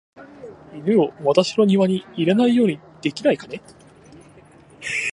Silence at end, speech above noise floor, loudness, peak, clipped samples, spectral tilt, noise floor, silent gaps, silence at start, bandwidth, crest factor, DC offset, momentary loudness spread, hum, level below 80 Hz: 0.05 s; 28 dB; -20 LUFS; -2 dBFS; under 0.1%; -6 dB/octave; -48 dBFS; none; 0.2 s; 11 kHz; 20 dB; under 0.1%; 20 LU; none; -62 dBFS